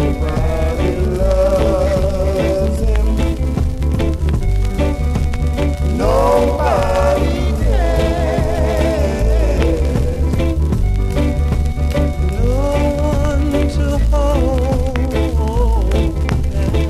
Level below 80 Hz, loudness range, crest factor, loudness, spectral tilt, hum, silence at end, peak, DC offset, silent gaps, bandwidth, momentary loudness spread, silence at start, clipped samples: -16 dBFS; 2 LU; 14 dB; -17 LUFS; -7.5 dB/octave; none; 0 s; 0 dBFS; under 0.1%; none; 13.5 kHz; 4 LU; 0 s; under 0.1%